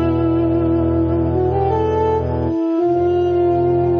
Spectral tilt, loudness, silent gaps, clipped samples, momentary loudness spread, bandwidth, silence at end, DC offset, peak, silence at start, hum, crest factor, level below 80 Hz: -10.5 dB/octave; -17 LUFS; none; under 0.1%; 2 LU; 5 kHz; 0 s; under 0.1%; -6 dBFS; 0 s; none; 10 dB; -32 dBFS